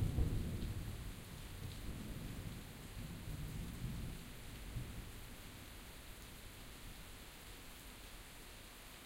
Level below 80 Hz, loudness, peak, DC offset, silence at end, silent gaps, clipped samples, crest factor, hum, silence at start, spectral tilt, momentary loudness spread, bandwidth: -50 dBFS; -49 LUFS; -24 dBFS; under 0.1%; 0 s; none; under 0.1%; 22 dB; none; 0 s; -5 dB/octave; 9 LU; 16 kHz